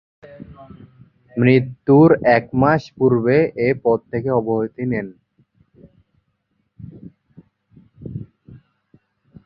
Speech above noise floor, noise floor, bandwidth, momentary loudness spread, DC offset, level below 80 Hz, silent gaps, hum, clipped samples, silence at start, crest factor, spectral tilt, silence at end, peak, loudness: 53 dB; -69 dBFS; 6.2 kHz; 26 LU; under 0.1%; -52 dBFS; none; none; under 0.1%; 0.3 s; 18 dB; -9.5 dB/octave; 0.9 s; -2 dBFS; -17 LUFS